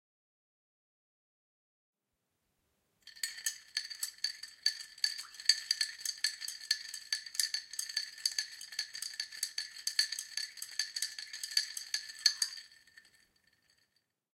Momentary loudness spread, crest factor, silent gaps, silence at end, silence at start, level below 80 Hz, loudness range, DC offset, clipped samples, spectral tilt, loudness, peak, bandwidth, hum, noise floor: 9 LU; 32 dB; none; 1.6 s; 3.05 s; -90 dBFS; 8 LU; under 0.1%; under 0.1%; 5.5 dB/octave; -35 LUFS; -8 dBFS; 16.5 kHz; none; -85 dBFS